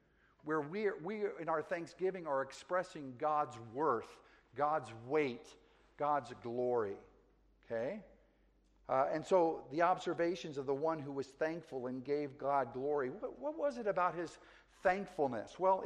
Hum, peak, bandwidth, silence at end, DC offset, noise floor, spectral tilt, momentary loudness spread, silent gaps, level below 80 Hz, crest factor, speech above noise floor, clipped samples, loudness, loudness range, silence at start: none; -18 dBFS; 10.5 kHz; 0 s; under 0.1%; -71 dBFS; -6 dB/octave; 9 LU; none; -72 dBFS; 20 dB; 34 dB; under 0.1%; -38 LUFS; 3 LU; 0.45 s